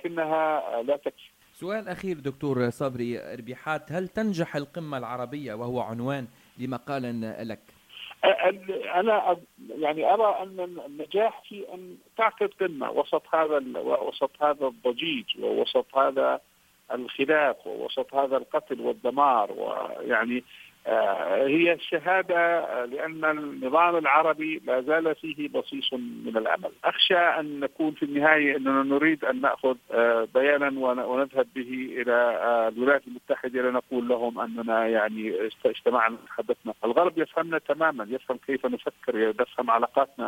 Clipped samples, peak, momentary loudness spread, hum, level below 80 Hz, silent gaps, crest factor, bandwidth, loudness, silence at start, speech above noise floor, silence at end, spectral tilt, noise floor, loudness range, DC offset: under 0.1%; -4 dBFS; 12 LU; none; -70 dBFS; none; 22 dB; 16.5 kHz; -26 LUFS; 0.05 s; 20 dB; 0 s; -6 dB/octave; -46 dBFS; 7 LU; under 0.1%